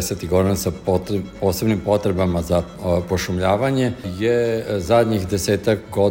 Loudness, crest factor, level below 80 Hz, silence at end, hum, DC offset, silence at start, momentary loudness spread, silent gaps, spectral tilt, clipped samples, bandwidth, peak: -20 LUFS; 16 dB; -40 dBFS; 0 s; none; under 0.1%; 0 s; 4 LU; none; -6 dB/octave; under 0.1%; 16.5 kHz; -4 dBFS